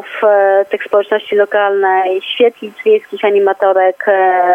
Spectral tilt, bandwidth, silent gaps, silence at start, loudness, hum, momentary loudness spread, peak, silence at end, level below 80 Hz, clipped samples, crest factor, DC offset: -5 dB/octave; 3.7 kHz; none; 0 s; -12 LUFS; none; 4 LU; 0 dBFS; 0 s; -72 dBFS; under 0.1%; 12 dB; under 0.1%